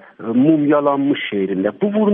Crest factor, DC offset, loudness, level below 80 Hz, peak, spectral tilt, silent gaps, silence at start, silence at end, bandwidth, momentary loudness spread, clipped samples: 14 dB; under 0.1%; -17 LUFS; -66 dBFS; -2 dBFS; -11 dB/octave; none; 0.2 s; 0 s; 3.7 kHz; 6 LU; under 0.1%